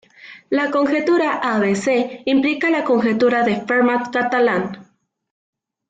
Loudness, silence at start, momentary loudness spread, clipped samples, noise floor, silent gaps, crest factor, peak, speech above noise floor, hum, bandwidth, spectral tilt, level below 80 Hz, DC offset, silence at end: -18 LUFS; 0.25 s; 4 LU; under 0.1%; -53 dBFS; none; 12 dB; -6 dBFS; 36 dB; none; 9.2 kHz; -5.5 dB/octave; -62 dBFS; under 0.1%; 1.05 s